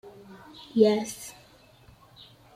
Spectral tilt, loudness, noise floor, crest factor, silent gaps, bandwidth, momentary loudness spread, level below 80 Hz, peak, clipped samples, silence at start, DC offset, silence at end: -5 dB/octave; -25 LUFS; -56 dBFS; 22 dB; none; 15.5 kHz; 26 LU; -66 dBFS; -8 dBFS; under 0.1%; 0.05 s; under 0.1%; 1.25 s